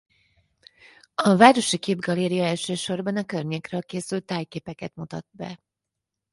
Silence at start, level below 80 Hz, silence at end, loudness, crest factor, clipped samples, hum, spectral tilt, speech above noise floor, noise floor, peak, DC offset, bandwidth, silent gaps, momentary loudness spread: 1.2 s; -66 dBFS; 0.75 s; -23 LUFS; 24 dB; under 0.1%; none; -5 dB/octave; 62 dB; -85 dBFS; 0 dBFS; under 0.1%; 11.5 kHz; none; 21 LU